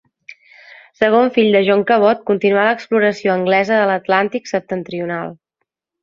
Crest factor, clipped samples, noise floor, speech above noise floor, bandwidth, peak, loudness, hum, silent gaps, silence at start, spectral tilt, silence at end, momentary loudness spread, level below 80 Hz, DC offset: 16 dB; under 0.1%; -75 dBFS; 60 dB; 7.4 kHz; 0 dBFS; -15 LUFS; none; none; 1 s; -6 dB/octave; 0.7 s; 10 LU; -62 dBFS; under 0.1%